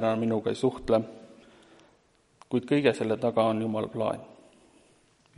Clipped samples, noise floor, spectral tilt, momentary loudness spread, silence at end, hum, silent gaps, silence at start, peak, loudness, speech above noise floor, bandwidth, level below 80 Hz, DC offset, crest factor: under 0.1%; -65 dBFS; -7 dB/octave; 8 LU; 1.1 s; none; none; 0 s; -8 dBFS; -28 LUFS; 38 dB; 11.5 kHz; -60 dBFS; under 0.1%; 20 dB